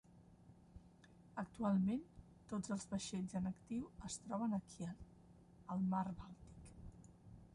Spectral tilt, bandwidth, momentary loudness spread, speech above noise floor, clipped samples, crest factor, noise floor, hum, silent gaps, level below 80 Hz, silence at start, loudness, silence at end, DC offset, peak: -6 dB/octave; 11.5 kHz; 23 LU; 23 dB; under 0.1%; 16 dB; -65 dBFS; none; none; -66 dBFS; 0.1 s; -44 LUFS; 0.05 s; under 0.1%; -28 dBFS